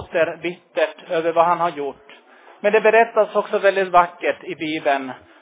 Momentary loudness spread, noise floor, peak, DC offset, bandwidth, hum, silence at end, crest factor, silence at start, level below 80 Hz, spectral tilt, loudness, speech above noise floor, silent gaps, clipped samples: 11 LU; -47 dBFS; -2 dBFS; under 0.1%; 4 kHz; none; 0.25 s; 18 dB; 0 s; -60 dBFS; -8.5 dB/octave; -19 LUFS; 28 dB; none; under 0.1%